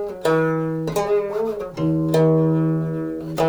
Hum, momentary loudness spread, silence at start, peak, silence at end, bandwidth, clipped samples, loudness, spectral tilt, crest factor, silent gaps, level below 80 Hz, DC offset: none; 9 LU; 0 s; -6 dBFS; 0 s; over 20 kHz; under 0.1%; -21 LUFS; -7.5 dB/octave; 14 dB; none; -50 dBFS; under 0.1%